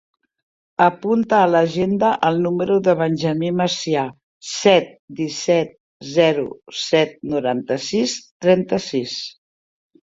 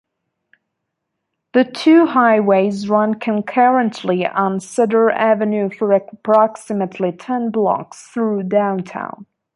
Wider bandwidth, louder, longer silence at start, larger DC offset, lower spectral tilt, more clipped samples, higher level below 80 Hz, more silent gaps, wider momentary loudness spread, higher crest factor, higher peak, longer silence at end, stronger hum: second, 7.8 kHz vs 11.5 kHz; second, -19 LUFS vs -16 LUFS; second, 0.8 s vs 1.55 s; neither; second, -5 dB/octave vs -6.5 dB/octave; neither; first, -60 dBFS vs -68 dBFS; first, 4.23-4.41 s, 4.99-5.08 s, 5.80-6.00 s, 8.31-8.40 s vs none; about the same, 12 LU vs 10 LU; about the same, 18 dB vs 16 dB; about the same, 0 dBFS vs -2 dBFS; first, 0.8 s vs 0.35 s; neither